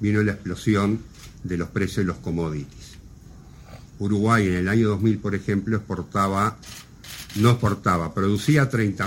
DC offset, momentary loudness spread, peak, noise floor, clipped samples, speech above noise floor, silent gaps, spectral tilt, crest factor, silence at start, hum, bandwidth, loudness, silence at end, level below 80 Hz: under 0.1%; 18 LU; -4 dBFS; -44 dBFS; under 0.1%; 22 dB; none; -6.5 dB/octave; 20 dB; 0 s; none; 16.5 kHz; -23 LUFS; 0 s; -46 dBFS